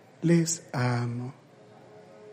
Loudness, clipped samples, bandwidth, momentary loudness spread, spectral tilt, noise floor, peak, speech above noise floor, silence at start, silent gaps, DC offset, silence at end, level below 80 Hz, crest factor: -27 LUFS; under 0.1%; 15.5 kHz; 13 LU; -5.5 dB/octave; -53 dBFS; -10 dBFS; 26 dB; 0.2 s; none; under 0.1%; 0 s; -70 dBFS; 18 dB